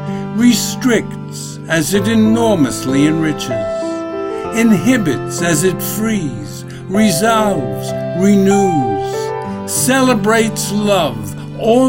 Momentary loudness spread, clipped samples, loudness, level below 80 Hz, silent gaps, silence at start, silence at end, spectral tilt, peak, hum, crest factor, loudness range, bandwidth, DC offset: 10 LU; under 0.1%; -14 LUFS; -40 dBFS; none; 0 s; 0 s; -5 dB/octave; 0 dBFS; none; 14 dB; 2 LU; 16.5 kHz; under 0.1%